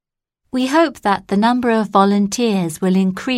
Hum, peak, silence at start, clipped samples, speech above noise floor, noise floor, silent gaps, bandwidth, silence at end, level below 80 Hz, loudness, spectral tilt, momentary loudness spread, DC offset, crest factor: none; -2 dBFS; 0.55 s; under 0.1%; 56 dB; -72 dBFS; none; 14 kHz; 0 s; -54 dBFS; -16 LUFS; -5.5 dB/octave; 5 LU; under 0.1%; 14 dB